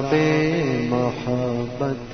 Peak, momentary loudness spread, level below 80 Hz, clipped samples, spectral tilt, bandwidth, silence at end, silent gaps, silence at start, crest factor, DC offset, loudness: -4 dBFS; 7 LU; -46 dBFS; under 0.1%; -7 dB/octave; 6.6 kHz; 0 s; none; 0 s; 18 dB; under 0.1%; -22 LUFS